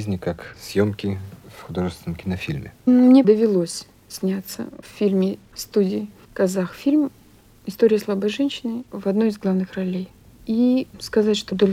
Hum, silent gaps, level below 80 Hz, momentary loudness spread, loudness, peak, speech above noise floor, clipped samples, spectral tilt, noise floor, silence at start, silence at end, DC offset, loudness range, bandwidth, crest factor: none; none; -54 dBFS; 16 LU; -21 LUFS; -4 dBFS; 30 dB; under 0.1%; -6.5 dB/octave; -51 dBFS; 0 s; 0 s; under 0.1%; 4 LU; 15.5 kHz; 18 dB